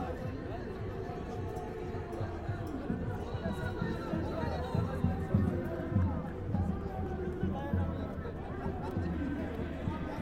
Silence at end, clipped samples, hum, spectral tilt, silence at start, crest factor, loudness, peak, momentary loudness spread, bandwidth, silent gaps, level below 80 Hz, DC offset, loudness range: 0 s; under 0.1%; none; -8.5 dB/octave; 0 s; 20 dB; -36 LUFS; -16 dBFS; 7 LU; 11 kHz; none; -46 dBFS; under 0.1%; 4 LU